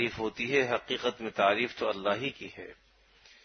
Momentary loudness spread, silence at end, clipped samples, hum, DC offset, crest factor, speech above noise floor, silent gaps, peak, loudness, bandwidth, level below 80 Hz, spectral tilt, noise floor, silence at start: 17 LU; 0.7 s; under 0.1%; none; under 0.1%; 22 dB; 29 dB; none; -10 dBFS; -30 LUFS; 6.6 kHz; -66 dBFS; -4.5 dB/octave; -60 dBFS; 0 s